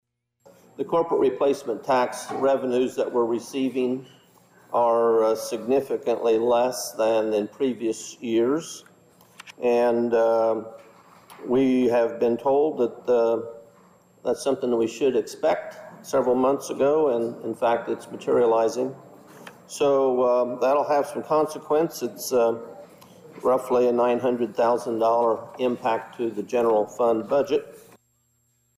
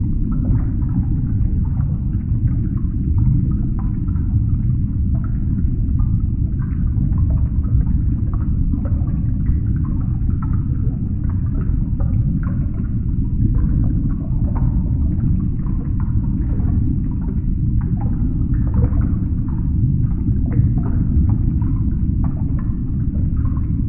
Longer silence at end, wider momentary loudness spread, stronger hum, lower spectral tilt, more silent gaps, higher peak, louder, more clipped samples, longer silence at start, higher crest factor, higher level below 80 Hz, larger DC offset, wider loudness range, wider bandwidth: first, 1 s vs 0 s; first, 9 LU vs 4 LU; neither; second, -5 dB/octave vs -14 dB/octave; neither; second, -14 dBFS vs -4 dBFS; second, -23 LUFS vs -20 LUFS; neither; first, 0.8 s vs 0 s; about the same, 10 dB vs 14 dB; second, -66 dBFS vs -20 dBFS; neither; about the same, 2 LU vs 2 LU; first, 15.5 kHz vs 2.4 kHz